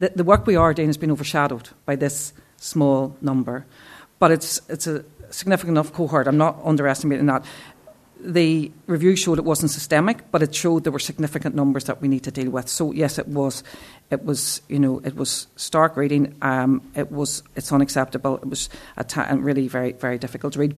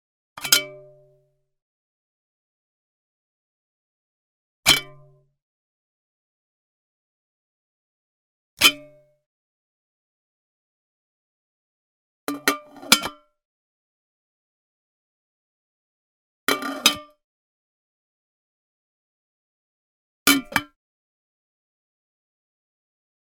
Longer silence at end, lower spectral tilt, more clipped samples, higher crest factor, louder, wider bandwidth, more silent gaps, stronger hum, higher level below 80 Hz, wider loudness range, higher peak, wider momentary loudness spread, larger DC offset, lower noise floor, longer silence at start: second, 0.05 s vs 2.75 s; first, -5 dB/octave vs -0.5 dB/octave; neither; second, 22 dB vs 30 dB; about the same, -21 LUFS vs -20 LUFS; second, 14 kHz vs 17.5 kHz; second, none vs 1.62-4.63 s, 5.42-8.57 s, 9.26-12.27 s, 13.45-16.47 s, 17.24-20.26 s; neither; first, -48 dBFS vs -60 dBFS; about the same, 3 LU vs 4 LU; about the same, 0 dBFS vs 0 dBFS; second, 10 LU vs 17 LU; neither; second, -47 dBFS vs -65 dBFS; second, 0 s vs 0.35 s